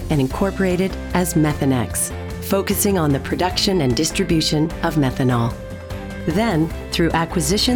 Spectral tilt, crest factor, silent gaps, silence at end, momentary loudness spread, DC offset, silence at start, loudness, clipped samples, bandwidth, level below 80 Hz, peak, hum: -5 dB/octave; 14 dB; none; 0 s; 6 LU; under 0.1%; 0 s; -19 LUFS; under 0.1%; 19.5 kHz; -34 dBFS; -4 dBFS; none